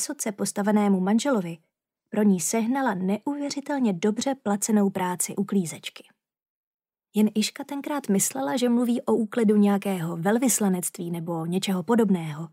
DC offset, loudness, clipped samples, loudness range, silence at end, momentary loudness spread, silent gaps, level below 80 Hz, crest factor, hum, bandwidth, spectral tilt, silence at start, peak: under 0.1%; -25 LUFS; under 0.1%; 4 LU; 0.05 s; 8 LU; 6.49-6.79 s; -78 dBFS; 14 dB; none; 16 kHz; -5 dB/octave; 0 s; -10 dBFS